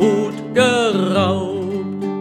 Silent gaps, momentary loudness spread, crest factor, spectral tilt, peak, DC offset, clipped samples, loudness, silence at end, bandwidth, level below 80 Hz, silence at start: none; 9 LU; 16 dB; -5.5 dB/octave; 0 dBFS; under 0.1%; under 0.1%; -18 LUFS; 0 s; 13.5 kHz; -62 dBFS; 0 s